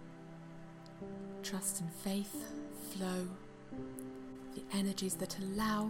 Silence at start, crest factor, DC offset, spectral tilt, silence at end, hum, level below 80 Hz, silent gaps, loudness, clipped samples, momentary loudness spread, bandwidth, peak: 0 s; 18 dB; under 0.1%; -4.5 dB/octave; 0 s; none; -62 dBFS; none; -41 LUFS; under 0.1%; 15 LU; 16.5 kHz; -24 dBFS